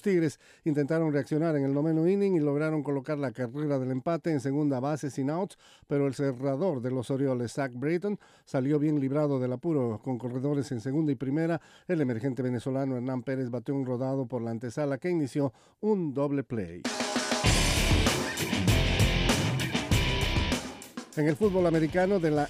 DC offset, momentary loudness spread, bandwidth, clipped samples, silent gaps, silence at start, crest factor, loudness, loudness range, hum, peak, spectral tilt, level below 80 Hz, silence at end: under 0.1%; 8 LU; 15.5 kHz; under 0.1%; none; 0.05 s; 16 dB; -29 LUFS; 5 LU; none; -12 dBFS; -5.5 dB/octave; -40 dBFS; 0 s